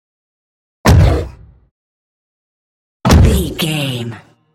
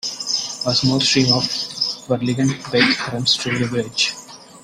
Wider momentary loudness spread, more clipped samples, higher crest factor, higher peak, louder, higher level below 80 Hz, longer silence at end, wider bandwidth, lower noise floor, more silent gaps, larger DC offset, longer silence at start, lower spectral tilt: first, 14 LU vs 7 LU; neither; about the same, 16 dB vs 20 dB; about the same, 0 dBFS vs 0 dBFS; first, -13 LUFS vs -18 LUFS; first, -22 dBFS vs -52 dBFS; first, 0.35 s vs 0.05 s; about the same, 16.5 kHz vs 15 kHz; second, -31 dBFS vs -39 dBFS; first, 1.71-3.00 s vs none; neither; first, 0.85 s vs 0.05 s; first, -6 dB/octave vs -3.5 dB/octave